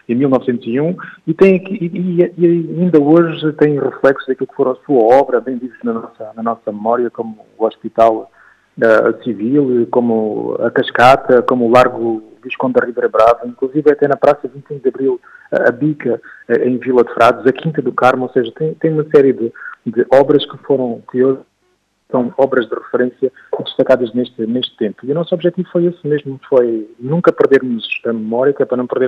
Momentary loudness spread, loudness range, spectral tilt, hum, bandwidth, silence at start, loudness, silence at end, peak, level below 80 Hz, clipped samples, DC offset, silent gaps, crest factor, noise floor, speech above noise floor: 10 LU; 4 LU; -7.5 dB/octave; none; 10 kHz; 0.1 s; -14 LUFS; 0 s; 0 dBFS; -54 dBFS; under 0.1%; under 0.1%; none; 14 dB; -61 dBFS; 48 dB